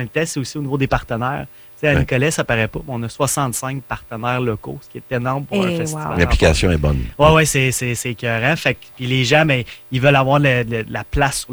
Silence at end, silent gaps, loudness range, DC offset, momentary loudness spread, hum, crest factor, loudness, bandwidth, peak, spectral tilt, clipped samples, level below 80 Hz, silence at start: 0 s; none; 5 LU; under 0.1%; 12 LU; none; 16 dB; -18 LUFS; over 20 kHz; -2 dBFS; -5 dB/octave; under 0.1%; -32 dBFS; 0 s